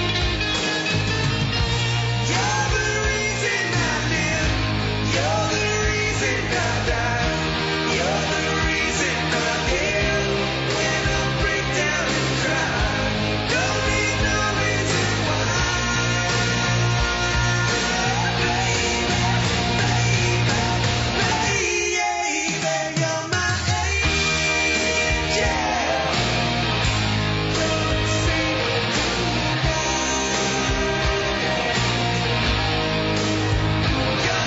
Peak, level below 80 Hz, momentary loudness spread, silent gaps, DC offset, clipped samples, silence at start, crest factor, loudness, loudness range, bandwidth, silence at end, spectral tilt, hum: -10 dBFS; -32 dBFS; 2 LU; none; under 0.1%; under 0.1%; 0 s; 12 dB; -21 LUFS; 1 LU; 8 kHz; 0 s; -3.5 dB/octave; none